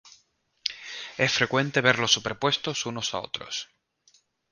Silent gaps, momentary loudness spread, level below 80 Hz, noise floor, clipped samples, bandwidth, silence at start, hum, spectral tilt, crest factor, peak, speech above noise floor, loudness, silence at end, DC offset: none; 13 LU; -62 dBFS; -67 dBFS; under 0.1%; 10.5 kHz; 0.05 s; none; -3 dB/octave; 26 dB; -2 dBFS; 41 dB; -26 LUFS; 0.85 s; under 0.1%